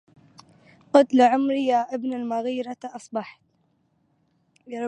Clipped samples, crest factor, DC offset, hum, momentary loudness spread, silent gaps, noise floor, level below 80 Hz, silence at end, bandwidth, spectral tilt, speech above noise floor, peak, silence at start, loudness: under 0.1%; 22 dB; under 0.1%; none; 17 LU; none; -68 dBFS; -78 dBFS; 0 s; 9.4 kHz; -5 dB/octave; 46 dB; -2 dBFS; 0.95 s; -23 LUFS